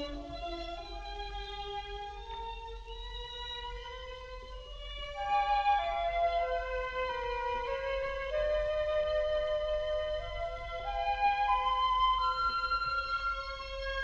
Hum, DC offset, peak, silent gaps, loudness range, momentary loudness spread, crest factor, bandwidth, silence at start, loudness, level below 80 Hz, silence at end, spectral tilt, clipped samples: none; under 0.1%; -18 dBFS; none; 11 LU; 14 LU; 16 dB; 8.2 kHz; 0 s; -33 LUFS; -46 dBFS; 0 s; -4 dB/octave; under 0.1%